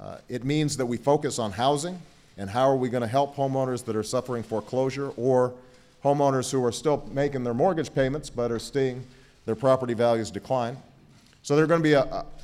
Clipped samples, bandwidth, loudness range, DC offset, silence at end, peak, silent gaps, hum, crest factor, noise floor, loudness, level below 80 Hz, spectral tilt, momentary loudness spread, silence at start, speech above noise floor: under 0.1%; 15 kHz; 2 LU; under 0.1%; 0 s; -8 dBFS; none; none; 18 dB; -55 dBFS; -26 LUFS; -52 dBFS; -5.5 dB/octave; 9 LU; 0 s; 30 dB